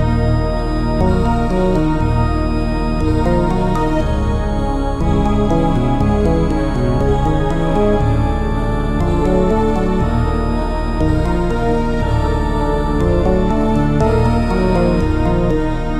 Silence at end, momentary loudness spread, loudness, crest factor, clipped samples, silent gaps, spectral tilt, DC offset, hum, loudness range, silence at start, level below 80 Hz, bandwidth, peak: 0 s; 4 LU; -16 LUFS; 12 dB; under 0.1%; none; -8 dB/octave; under 0.1%; none; 2 LU; 0 s; -18 dBFS; 11 kHz; -2 dBFS